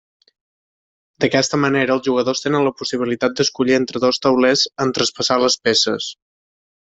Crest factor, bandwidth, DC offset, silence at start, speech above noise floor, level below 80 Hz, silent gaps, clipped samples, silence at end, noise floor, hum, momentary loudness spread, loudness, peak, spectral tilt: 16 dB; 8.2 kHz; under 0.1%; 1.2 s; over 73 dB; -58 dBFS; none; under 0.1%; 0.7 s; under -90 dBFS; none; 5 LU; -17 LUFS; -2 dBFS; -3.5 dB/octave